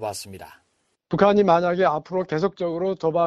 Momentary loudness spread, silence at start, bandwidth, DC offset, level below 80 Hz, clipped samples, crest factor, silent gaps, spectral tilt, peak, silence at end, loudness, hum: 16 LU; 0 s; 13.5 kHz; under 0.1%; -58 dBFS; under 0.1%; 18 dB; none; -6.5 dB/octave; -4 dBFS; 0 s; -21 LUFS; none